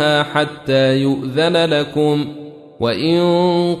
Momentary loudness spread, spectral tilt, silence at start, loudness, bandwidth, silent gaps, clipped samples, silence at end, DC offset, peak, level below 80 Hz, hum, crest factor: 7 LU; -6 dB/octave; 0 s; -16 LUFS; 13 kHz; none; under 0.1%; 0 s; under 0.1%; -2 dBFS; -54 dBFS; none; 14 dB